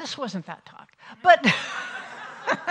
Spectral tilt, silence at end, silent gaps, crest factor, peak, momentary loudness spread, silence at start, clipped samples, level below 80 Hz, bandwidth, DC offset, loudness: -4 dB/octave; 0 s; none; 24 dB; -2 dBFS; 21 LU; 0 s; under 0.1%; -72 dBFS; 10 kHz; under 0.1%; -22 LUFS